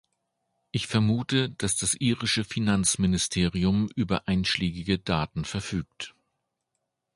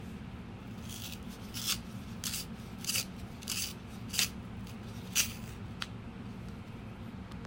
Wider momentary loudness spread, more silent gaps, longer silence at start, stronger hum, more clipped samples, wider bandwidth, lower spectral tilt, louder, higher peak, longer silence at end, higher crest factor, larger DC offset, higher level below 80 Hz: second, 9 LU vs 14 LU; neither; first, 0.75 s vs 0 s; neither; neither; second, 11.5 kHz vs 16.5 kHz; first, -4 dB/octave vs -2 dB/octave; first, -26 LUFS vs -38 LUFS; about the same, -8 dBFS vs -10 dBFS; first, 1.05 s vs 0 s; second, 20 dB vs 28 dB; neither; first, -46 dBFS vs -54 dBFS